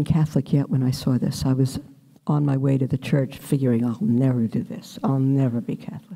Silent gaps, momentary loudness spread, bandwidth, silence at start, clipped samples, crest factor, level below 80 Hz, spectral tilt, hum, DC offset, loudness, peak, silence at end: none; 8 LU; 15.5 kHz; 0 s; under 0.1%; 14 dB; -50 dBFS; -8 dB/octave; none; under 0.1%; -23 LUFS; -8 dBFS; 0 s